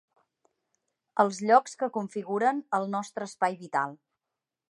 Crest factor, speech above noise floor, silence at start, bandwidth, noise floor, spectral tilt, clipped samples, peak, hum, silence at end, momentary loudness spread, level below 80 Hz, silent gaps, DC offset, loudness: 22 dB; 61 dB; 1.15 s; 11.5 kHz; -88 dBFS; -5 dB/octave; under 0.1%; -8 dBFS; none; 0.75 s; 11 LU; -84 dBFS; none; under 0.1%; -28 LUFS